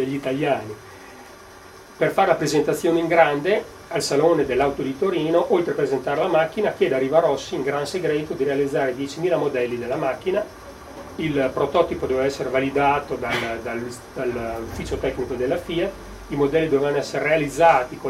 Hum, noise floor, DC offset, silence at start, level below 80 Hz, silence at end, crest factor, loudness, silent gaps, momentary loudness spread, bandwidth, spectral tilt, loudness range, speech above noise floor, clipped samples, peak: none; -43 dBFS; under 0.1%; 0 s; -48 dBFS; 0 s; 20 dB; -22 LUFS; none; 11 LU; 15.5 kHz; -5.5 dB/octave; 4 LU; 22 dB; under 0.1%; -2 dBFS